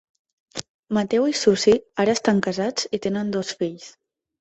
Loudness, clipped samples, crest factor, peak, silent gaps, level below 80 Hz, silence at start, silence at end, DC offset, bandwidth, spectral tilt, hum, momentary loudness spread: -22 LUFS; under 0.1%; 18 dB; -4 dBFS; 0.69-0.83 s; -58 dBFS; 0.55 s; 0.5 s; under 0.1%; 8.4 kHz; -4.5 dB/octave; none; 17 LU